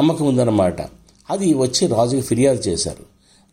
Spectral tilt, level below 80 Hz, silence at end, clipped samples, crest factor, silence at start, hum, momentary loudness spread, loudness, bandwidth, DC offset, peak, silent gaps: -5.5 dB/octave; -48 dBFS; 0.5 s; under 0.1%; 14 dB; 0 s; none; 11 LU; -18 LUFS; 16 kHz; under 0.1%; -4 dBFS; none